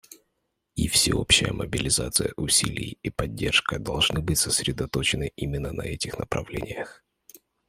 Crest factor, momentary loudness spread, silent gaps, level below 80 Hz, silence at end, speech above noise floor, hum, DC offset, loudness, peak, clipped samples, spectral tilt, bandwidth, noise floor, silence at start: 22 dB; 12 LU; none; -42 dBFS; 0.3 s; 51 dB; none; under 0.1%; -24 LUFS; -4 dBFS; under 0.1%; -2.5 dB/octave; 16 kHz; -77 dBFS; 0.1 s